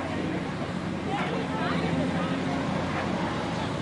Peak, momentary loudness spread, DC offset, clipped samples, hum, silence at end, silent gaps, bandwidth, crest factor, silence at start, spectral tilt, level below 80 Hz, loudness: -14 dBFS; 4 LU; under 0.1%; under 0.1%; none; 0 s; none; 11 kHz; 14 dB; 0 s; -6 dB/octave; -54 dBFS; -29 LUFS